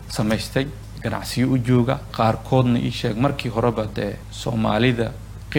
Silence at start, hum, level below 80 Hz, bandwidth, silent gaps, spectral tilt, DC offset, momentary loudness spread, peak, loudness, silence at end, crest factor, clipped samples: 0 s; none; -40 dBFS; 17.5 kHz; none; -6.5 dB/octave; under 0.1%; 9 LU; -4 dBFS; -22 LUFS; 0 s; 18 dB; under 0.1%